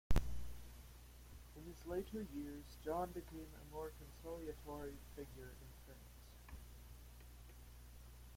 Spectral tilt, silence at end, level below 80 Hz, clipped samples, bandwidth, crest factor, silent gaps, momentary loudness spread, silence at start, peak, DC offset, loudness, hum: -6 dB/octave; 0 s; -52 dBFS; under 0.1%; 16.5 kHz; 24 dB; none; 16 LU; 0.1 s; -22 dBFS; under 0.1%; -51 LUFS; 60 Hz at -60 dBFS